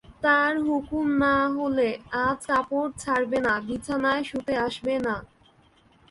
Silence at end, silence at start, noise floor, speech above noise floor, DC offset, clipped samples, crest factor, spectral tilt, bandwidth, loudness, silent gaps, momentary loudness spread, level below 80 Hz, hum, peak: 0.85 s; 0.1 s; -59 dBFS; 34 dB; under 0.1%; under 0.1%; 18 dB; -5 dB/octave; 11.5 kHz; -25 LUFS; none; 7 LU; -54 dBFS; none; -8 dBFS